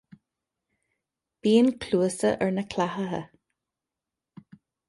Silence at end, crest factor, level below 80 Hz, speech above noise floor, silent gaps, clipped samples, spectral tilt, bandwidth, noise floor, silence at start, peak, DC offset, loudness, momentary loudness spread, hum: 1.65 s; 18 dB; -62 dBFS; 64 dB; none; under 0.1%; -5.5 dB/octave; 11.5 kHz; -88 dBFS; 1.45 s; -10 dBFS; under 0.1%; -25 LUFS; 11 LU; none